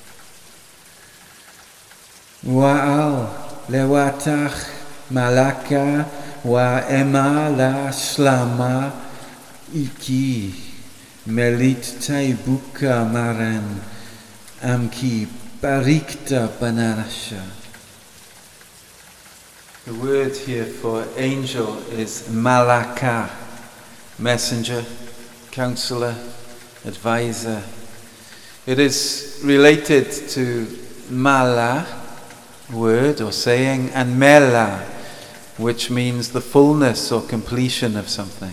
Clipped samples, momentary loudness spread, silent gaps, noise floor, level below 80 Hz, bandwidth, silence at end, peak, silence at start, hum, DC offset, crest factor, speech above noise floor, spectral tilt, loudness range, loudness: under 0.1%; 21 LU; none; -46 dBFS; -52 dBFS; 15.5 kHz; 0 s; 0 dBFS; 0 s; none; under 0.1%; 20 dB; 27 dB; -5.5 dB/octave; 9 LU; -19 LUFS